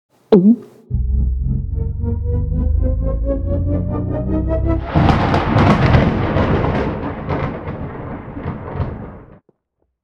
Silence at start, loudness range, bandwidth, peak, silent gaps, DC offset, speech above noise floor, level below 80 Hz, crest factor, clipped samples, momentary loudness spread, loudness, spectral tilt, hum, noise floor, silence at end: 0.3 s; 6 LU; 7 kHz; 0 dBFS; none; under 0.1%; 55 dB; -24 dBFS; 16 dB; under 0.1%; 14 LU; -18 LUFS; -9 dB/octave; none; -69 dBFS; 0.8 s